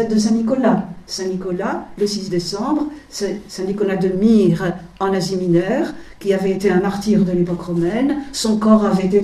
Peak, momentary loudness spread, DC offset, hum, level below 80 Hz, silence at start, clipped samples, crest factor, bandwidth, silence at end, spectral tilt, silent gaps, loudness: -2 dBFS; 11 LU; under 0.1%; none; -46 dBFS; 0 s; under 0.1%; 16 dB; 13 kHz; 0 s; -6 dB/octave; none; -18 LUFS